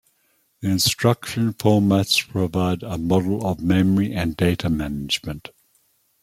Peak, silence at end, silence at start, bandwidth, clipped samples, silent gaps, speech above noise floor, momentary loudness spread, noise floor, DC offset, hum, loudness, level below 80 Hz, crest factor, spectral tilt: -2 dBFS; 0.85 s; 0.6 s; 16 kHz; under 0.1%; none; 45 dB; 7 LU; -65 dBFS; under 0.1%; none; -21 LUFS; -46 dBFS; 18 dB; -5 dB/octave